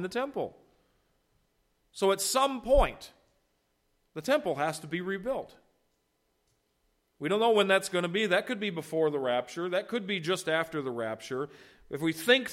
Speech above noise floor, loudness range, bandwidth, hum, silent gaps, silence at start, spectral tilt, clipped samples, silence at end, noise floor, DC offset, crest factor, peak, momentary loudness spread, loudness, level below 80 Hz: 46 dB; 6 LU; 16.5 kHz; none; none; 0 s; -3.5 dB/octave; under 0.1%; 0 s; -75 dBFS; under 0.1%; 22 dB; -10 dBFS; 12 LU; -30 LUFS; -46 dBFS